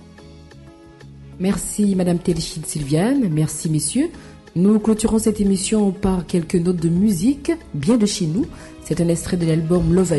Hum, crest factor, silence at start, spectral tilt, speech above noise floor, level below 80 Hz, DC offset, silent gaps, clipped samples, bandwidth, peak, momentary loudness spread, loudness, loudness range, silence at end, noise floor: none; 14 dB; 0 s; -6 dB/octave; 24 dB; -38 dBFS; under 0.1%; none; under 0.1%; 12 kHz; -6 dBFS; 7 LU; -19 LUFS; 3 LU; 0 s; -42 dBFS